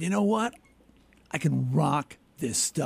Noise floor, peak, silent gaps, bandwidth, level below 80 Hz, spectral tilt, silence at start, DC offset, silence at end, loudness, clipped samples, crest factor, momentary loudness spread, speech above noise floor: -59 dBFS; -12 dBFS; none; 15.5 kHz; -62 dBFS; -5 dB/octave; 0 s; under 0.1%; 0 s; -28 LUFS; under 0.1%; 16 dB; 10 LU; 32 dB